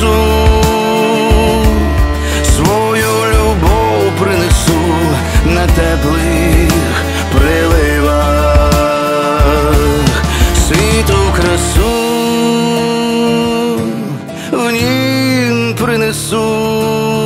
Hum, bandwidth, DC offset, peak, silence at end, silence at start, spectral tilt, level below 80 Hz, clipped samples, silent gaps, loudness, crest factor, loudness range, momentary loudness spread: none; 16 kHz; under 0.1%; 0 dBFS; 0 s; 0 s; -5 dB/octave; -16 dBFS; under 0.1%; none; -11 LUFS; 10 dB; 2 LU; 3 LU